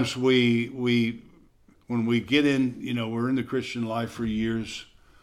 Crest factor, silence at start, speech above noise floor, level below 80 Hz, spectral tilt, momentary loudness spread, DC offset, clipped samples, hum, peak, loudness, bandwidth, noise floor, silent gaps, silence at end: 18 dB; 0 s; 33 dB; -56 dBFS; -6 dB/octave; 10 LU; under 0.1%; under 0.1%; none; -8 dBFS; -26 LUFS; 12.5 kHz; -58 dBFS; none; 0.4 s